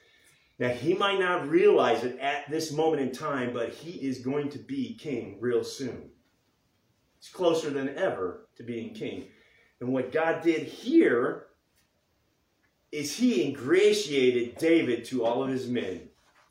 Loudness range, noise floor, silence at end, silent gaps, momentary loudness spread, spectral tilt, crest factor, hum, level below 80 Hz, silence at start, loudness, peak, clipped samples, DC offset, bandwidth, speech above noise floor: 7 LU; -72 dBFS; 0.45 s; none; 15 LU; -5 dB/octave; 18 dB; none; -72 dBFS; 0.6 s; -28 LUFS; -12 dBFS; under 0.1%; under 0.1%; 16 kHz; 44 dB